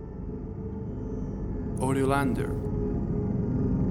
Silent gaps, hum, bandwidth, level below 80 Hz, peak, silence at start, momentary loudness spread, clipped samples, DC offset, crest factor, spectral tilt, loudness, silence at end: none; none; 13.5 kHz; -38 dBFS; -12 dBFS; 0 s; 11 LU; under 0.1%; under 0.1%; 18 dB; -8 dB/octave; -30 LUFS; 0 s